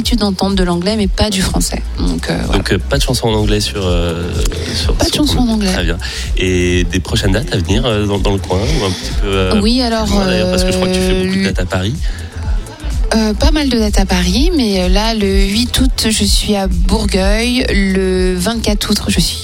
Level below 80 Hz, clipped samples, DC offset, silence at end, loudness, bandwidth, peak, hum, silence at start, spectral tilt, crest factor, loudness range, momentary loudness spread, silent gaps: -18 dBFS; under 0.1%; under 0.1%; 0 s; -14 LUFS; 16.5 kHz; 0 dBFS; none; 0 s; -4.5 dB/octave; 12 dB; 2 LU; 5 LU; none